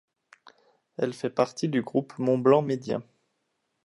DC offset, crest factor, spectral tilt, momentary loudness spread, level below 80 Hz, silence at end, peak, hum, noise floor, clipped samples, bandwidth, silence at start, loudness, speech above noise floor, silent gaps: under 0.1%; 22 dB; -7 dB/octave; 12 LU; -74 dBFS; 0.85 s; -6 dBFS; none; -77 dBFS; under 0.1%; 11.5 kHz; 1 s; -26 LUFS; 52 dB; none